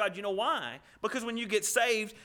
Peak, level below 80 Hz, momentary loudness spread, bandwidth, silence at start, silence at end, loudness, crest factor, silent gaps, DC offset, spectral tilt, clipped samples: -12 dBFS; -70 dBFS; 9 LU; over 20 kHz; 0 s; 0 s; -31 LUFS; 20 dB; none; under 0.1%; -1.5 dB/octave; under 0.1%